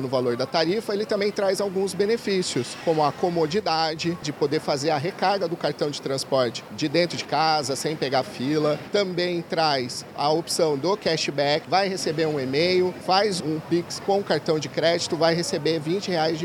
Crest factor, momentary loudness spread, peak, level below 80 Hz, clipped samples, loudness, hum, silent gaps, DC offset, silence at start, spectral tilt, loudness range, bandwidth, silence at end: 18 dB; 5 LU; -6 dBFS; -64 dBFS; under 0.1%; -24 LUFS; none; none; under 0.1%; 0 s; -4.5 dB/octave; 2 LU; 17 kHz; 0 s